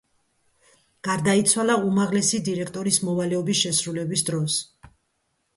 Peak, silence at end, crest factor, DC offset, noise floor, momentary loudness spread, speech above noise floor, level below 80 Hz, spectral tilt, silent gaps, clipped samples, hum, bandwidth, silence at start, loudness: -6 dBFS; 0.7 s; 20 dB; under 0.1%; -73 dBFS; 8 LU; 50 dB; -62 dBFS; -3.5 dB/octave; none; under 0.1%; none; 12 kHz; 1.05 s; -22 LUFS